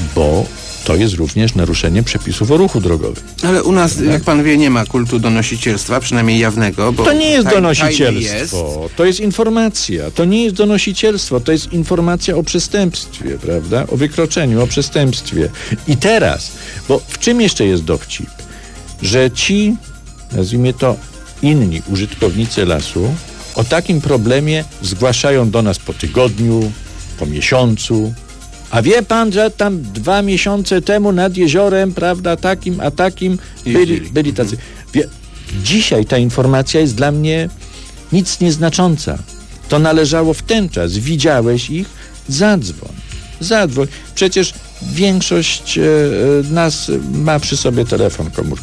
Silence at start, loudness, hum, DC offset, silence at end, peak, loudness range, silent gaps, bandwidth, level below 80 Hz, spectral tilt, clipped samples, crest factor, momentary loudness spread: 0 s; -14 LUFS; none; under 0.1%; 0 s; 0 dBFS; 3 LU; none; 11 kHz; -30 dBFS; -5 dB/octave; under 0.1%; 14 dB; 11 LU